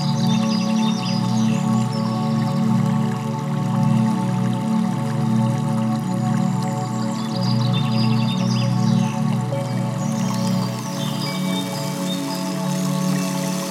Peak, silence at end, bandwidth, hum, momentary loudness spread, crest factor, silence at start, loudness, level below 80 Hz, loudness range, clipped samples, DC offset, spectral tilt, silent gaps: -6 dBFS; 0 s; 16 kHz; none; 5 LU; 14 dB; 0 s; -21 LUFS; -68 dBFS; 3 LU; under 0.1%; under 0.1%; -6 dB/octave; none